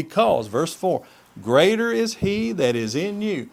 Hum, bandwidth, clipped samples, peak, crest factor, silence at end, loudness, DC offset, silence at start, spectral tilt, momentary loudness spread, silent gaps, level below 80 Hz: none; 16 kHz; under 0.1%; -2 dBFS; 18 dB; 0.05 s; -21 LUFS; under 0.1%; 0 s; -5 dB/octave; 8 LU; none; -52 dBFS